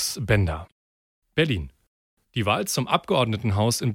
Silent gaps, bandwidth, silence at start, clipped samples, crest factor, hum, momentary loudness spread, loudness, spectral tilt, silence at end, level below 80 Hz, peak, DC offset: 0.72-1.22 s, 1.87-2.17 s; 17 kHz; 0 s; under 0.1%; 20 dB; none; 8 LU; -24 LUFS; -4.5 dB/octave; 0 s; -44 dBFS; -4 dBFS; under 0.1%